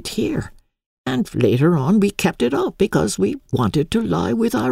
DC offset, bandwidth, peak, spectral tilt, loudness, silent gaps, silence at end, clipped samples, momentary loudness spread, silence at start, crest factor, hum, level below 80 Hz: under 0.1%; 16 kHz; -2 dBFS; -6 dB/octave; -19 LUFS; 0.86-1.04 s; 0 s; under 0.1%; 7 LU; 0 s; 16 dB; none; -44 dBFS